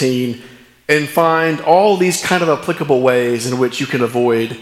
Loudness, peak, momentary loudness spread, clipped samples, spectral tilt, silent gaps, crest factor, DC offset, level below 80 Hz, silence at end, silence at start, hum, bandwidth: -15 LUFS; 0 dBFS; 6 LU; under 0.1%; -5 dB/octave; none; 14 dB; under 0.1%; -58 dBFS; 0 s; 0 s; none; 16 kHz